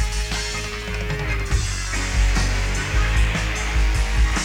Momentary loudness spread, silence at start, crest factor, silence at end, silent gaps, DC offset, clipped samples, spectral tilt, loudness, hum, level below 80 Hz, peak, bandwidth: 5 LU; 0 s; 12 dB; 0 s; none; under 0.1%; under 0.1%; -3.5 dB/octave; -23 LUFS; none; -22 dBFS; -8 dBFS; 15.5 kHz